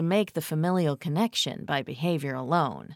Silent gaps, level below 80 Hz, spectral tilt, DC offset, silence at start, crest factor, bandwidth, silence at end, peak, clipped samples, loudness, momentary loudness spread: none; -70 dBFS; -5.5 dB/octave; under 0.1%; 0 s; 16 dB; 17 kHz; 0 s; -12 dBFS; under 0.1%; -27 LUFS; 4 LU